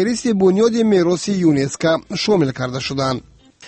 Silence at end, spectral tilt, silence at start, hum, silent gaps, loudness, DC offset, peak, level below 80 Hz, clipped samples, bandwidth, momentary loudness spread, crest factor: 0 s; -5.5 dB/octave; 0 s; none; none; -17 LUFS; under 0.1%; -4 dBFS; -50 dBFS; under 0.1%; 8.8 kHz; 8 LU; 14 dB